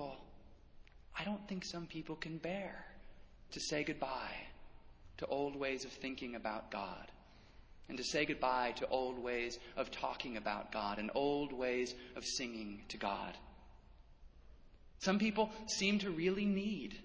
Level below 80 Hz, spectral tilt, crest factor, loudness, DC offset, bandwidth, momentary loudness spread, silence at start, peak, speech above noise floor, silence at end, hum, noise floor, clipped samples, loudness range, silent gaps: -62 dBFS; -4 dB/octave; 24 dB; -40 LUFS; under 0.1%; 8 kHz; 13 LU; 0 s; -18 dBFS; 20 dB; 0 s; none; -60 dBFS; under 0.1%; 5 LU; none